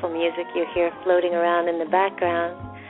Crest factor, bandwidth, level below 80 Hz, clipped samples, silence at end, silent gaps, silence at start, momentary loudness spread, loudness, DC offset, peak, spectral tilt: 16 dB; 4.1 kHz; -58 dBFS; under 0.1%; 0 s; none; 0 s; 5 LU; -23 LUFS; under 0.1%; -8 dBFS; -3 dB/octave